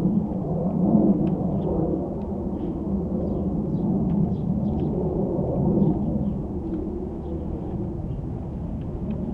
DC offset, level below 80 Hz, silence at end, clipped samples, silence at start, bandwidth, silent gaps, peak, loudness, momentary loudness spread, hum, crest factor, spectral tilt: under 0.1%; -38 dBFS; 0 s; under 0.1%; 0 s; 3.5 kHz; none; -8 dBFS; -25 LUFS; 10 LU; none; 18 dB; -12.5 dB/octave